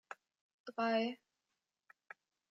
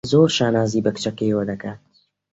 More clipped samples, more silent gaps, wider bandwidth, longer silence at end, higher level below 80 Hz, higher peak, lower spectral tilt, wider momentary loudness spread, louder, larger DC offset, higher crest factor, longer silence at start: neither; first, 0.41-0.64 s vs none; about the same, 7.6 kHz vs 8.2 kHz; first, 1.35 s vs 0.55 s; second, under -90 dBFS vs -54 dBFS; second, -24 dBFS vs -2 dBFS; about the same, -5 dB/octave vs -5.5 dB/octave; first, 23 LU vs 13 LU; second, -38 LUFS vs -20 LUFS; neither; about the same, 18 dB vs 18 dB; about the same, 0.1 s vs 0.05 s